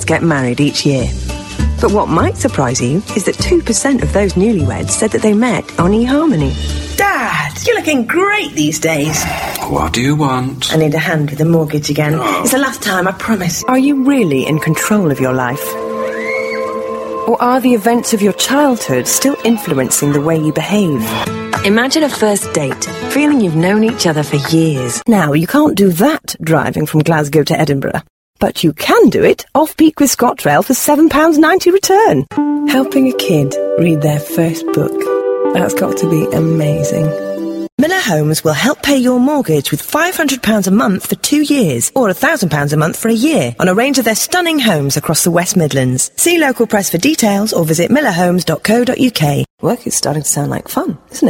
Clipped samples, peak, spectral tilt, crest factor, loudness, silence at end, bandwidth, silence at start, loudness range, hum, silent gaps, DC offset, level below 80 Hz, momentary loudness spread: under 0.1%; 0 dBFS; -4.5 dB/octave; 12 dB; -13 LUFS; 0 s; 16.5 kHz; 0 s; 3 LU; none; 28.10-28.34 s, 37.72-37.78 s, 49.50-49.58 s; under 0.1%; -32 dBFS; 6 LU